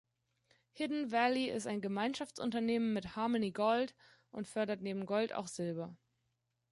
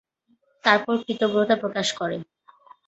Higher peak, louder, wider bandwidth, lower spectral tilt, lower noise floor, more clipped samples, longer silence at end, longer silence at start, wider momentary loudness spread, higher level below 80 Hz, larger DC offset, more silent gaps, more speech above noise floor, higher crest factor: second, -20 dBFS vs -2 dBFS; second, -37 LUFS vs -23 LUFS; first, 11.5 kHz vs 8.2 kHz; about the same, -5 dB/octave vs -4 dB/octave; first, -83 dBFS vs -66 dBFS; neither; about the same, 0.75 s vs 0.65 s; about the same, 0.75 s vs 0.65 s; about the same, 9 LU vs 9 LU; second, -74 dBFS vs -68 dBFS; neither; neither; about the same, 47 dB vs 44 dB; about the same, 18 dB vs 22 dB